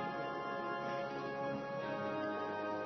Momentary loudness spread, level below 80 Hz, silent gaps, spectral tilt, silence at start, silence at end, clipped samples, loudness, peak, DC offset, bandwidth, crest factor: 2 LU; -78 dBFS; none; -4 dB/octave; 0 s; 0 s; under 0.1%; -40 LUFS; -28 dBFS; under 0.1%; 6.2 kHz; 12 dB